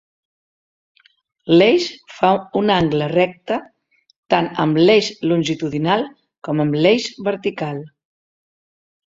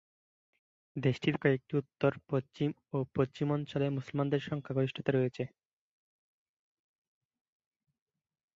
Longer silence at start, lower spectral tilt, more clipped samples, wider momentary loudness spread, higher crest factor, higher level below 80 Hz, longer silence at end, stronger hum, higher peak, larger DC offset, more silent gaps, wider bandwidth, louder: first, 1.45 s vs 0.95 s; second, -6 dB/octave vs -8 dB/octave; neither; first, 13 LU vs 6 LU; about the same, 18 dB vs 22 dB; first, -56 dBFS vs -70 dBFS; second, 1.2 s vs 3.1 s; neither; first, 0 dBFS vs -14 dBFS; neither; first, 4.18-4.23 s vs none; about the same, 7.8 kHz vs 7.6 kHz; first, -18 LUFS vs -33 LUFS